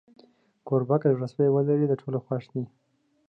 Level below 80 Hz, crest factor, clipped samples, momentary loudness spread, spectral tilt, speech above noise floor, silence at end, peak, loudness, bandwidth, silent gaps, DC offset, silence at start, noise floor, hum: -74 dBFS; 16 dB; under 0.1%; 11 LU; -11 dB/octave; 34 dB; 0.65 s; -10 dBFS; -26 LUFS; 5.8 kHz; none; under 0.1%; 0.65 s; -59 dBFS; none